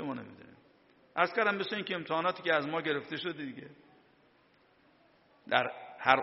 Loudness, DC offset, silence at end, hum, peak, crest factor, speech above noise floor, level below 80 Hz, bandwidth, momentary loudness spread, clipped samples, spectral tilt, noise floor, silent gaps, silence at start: -32 LUFS; under 0.1%; 0 s; none; -6 dBFS; 28 dB; 34 dB; -76 dBFS; 5.8 kHz; 15 LU; under 0.1%; -1.5 dB/octave; -66 dBFS; none; 0 s